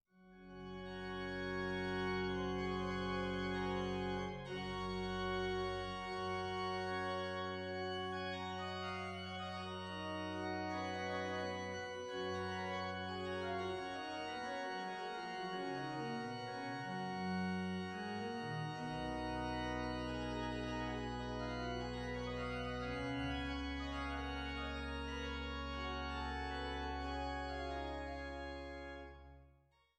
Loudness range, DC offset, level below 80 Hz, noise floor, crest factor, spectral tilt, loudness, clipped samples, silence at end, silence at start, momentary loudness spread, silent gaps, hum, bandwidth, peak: 3 LU; under 0.1%; -54 dBFS; -71 dBFS; 14 dB; -5.5 dB/octave; -42 LUFS; under 0.1%; 0.5 s; 0.15 s; 5 LU; none; none; 12 kHz; -28 dBFS